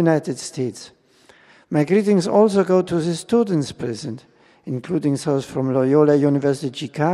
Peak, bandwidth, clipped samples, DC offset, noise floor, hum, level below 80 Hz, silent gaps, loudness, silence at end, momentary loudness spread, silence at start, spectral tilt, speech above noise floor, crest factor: -2 dBFS; 12.5 kHz; under 0.1%; under 0.1%; -53 dBFS; none; -60 dBFS; none; -20 LUFS; 0 s; 14 LU; 0 s; -6.5 dB/octave; 34 dB; 16 dB